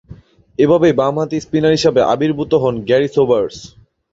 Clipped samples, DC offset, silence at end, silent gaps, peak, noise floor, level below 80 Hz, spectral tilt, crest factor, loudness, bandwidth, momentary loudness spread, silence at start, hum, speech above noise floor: under 0.1%; under 0.1%; 0.45 s; none; -2 dBFS; -40 dBFS; -48 dBFS; -6.5 dB/octave; 14 dB; -15 LUFS; 7.8 kHz; 8 LU; 0.1 s; none; 26 dB